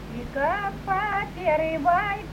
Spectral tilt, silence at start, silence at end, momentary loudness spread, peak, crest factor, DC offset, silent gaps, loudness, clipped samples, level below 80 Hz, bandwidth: -6.5 dB/octave; 0 s; 0 s; 5 LU; -10 dBFS; 16 dB; under 0.1%; none; -25 LUFS; under 0.1%; -42 dBFS; 16 kHz